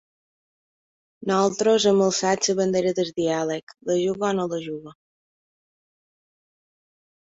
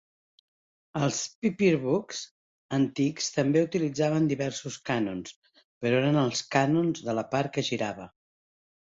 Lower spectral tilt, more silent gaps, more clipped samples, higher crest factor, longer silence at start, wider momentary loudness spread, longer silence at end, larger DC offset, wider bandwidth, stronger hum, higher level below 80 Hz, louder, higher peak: about the same, -4 dB/octave vs -5 dB/octave; second, 3.63-3.67 s vs 1.35-1.42 s, 2.31-2.69 s, 5.36-5.42 s, 5.64-5.81 s; neither; about the same, 18 dB vs 20 dB; first, 1.2 s vs 0.95 s; about the same, 12 LU vs 11 LU; first, 2.3 s vs 0.75 s; neither; about the same, 8 kHz vs 7.8 kHz; neither; about the same, -66 dBFS vs -66 dBFS; first, -22 LUFS vs -28 LUFS; about the same, -8 dBFS vs -8 dBFS